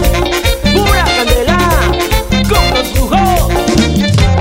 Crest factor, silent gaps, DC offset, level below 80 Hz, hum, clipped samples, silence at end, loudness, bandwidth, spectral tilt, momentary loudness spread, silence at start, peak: 10 dB; none; under 0.1%; -16 dBFS; none; under 0.1%; 0 s; -11 LUFS; 16.5 kHz; -5 dB/octave; 3 LU; 0 s; 0 dBFS